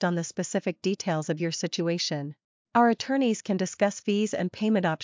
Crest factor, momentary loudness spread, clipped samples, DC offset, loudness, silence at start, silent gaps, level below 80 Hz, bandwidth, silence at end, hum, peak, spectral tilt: 18 dB; 6 LU; under 0.1%; under 0.1%; -27 LUFS; 0 s; 2.44-2.65 s; -72 dBFS; 7.6 kHz; 0 s; none; -10 dBFS; -5 dB/octave